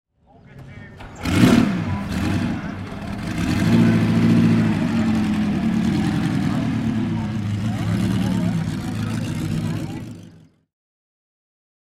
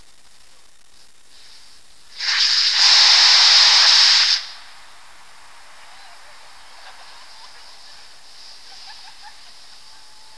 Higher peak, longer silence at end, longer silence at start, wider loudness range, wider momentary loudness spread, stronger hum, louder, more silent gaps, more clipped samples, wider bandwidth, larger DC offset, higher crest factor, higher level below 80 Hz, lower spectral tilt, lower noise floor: about the same, 0 dBFS vs 0 dBFS; first, 1.65 s vs 1.45 s; second, 0.55 s vs 2.15 s; about the same, 7 LU vs 7 LU; first, 15 LU vs 12 LU; neither; second, -21 LUFS vs -11 LUFS; neither; neither; first, 15 kHz vs 11 kHz; second, under 0.1% vs 0.9%; about the same, 20 dB vs 20 dB; first, -40 dBFS vs -66 dBFS; first, -7 dB/octave vs 4.5 dB/octave; about the same, -49 dBFS vs -52 dBFS